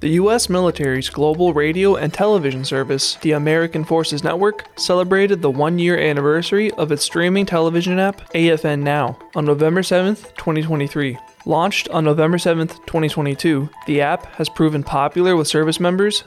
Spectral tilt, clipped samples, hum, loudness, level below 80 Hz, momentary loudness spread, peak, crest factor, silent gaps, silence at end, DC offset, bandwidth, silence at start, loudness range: -5 dB/octave; under 0.1%; none; -17 LUFS; -48 dBFS; 6 LU; -6 dBFS; 12 dB; none; 0.05 s; under 0.1%; 14.5 kHz; 0 s; 2 LU